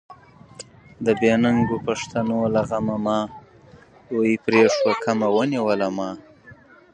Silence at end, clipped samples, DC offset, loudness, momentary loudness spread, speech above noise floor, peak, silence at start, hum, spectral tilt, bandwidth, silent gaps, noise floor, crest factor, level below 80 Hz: 0.4 s; under 0.1%; under 0.1%; -21 LUFS; 15 LU; 29 dB; -4 dBFS; 0.1 s; none; -6 dB/octave; 9.6 kHz; none; -49 dBFS; 18 dB; -54 dBFS